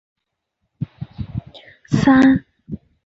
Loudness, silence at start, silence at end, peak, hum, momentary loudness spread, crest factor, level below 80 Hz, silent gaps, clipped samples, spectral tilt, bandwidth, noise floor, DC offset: -15 LUFS; 0.8 s; 0.3 s; -4 dBFS; none; 23 LU; 16 dB; -44 dBFS; none; under 0.1%; -7 dB/octave; 7.8 kHz; -75 dBFS; under 0.1%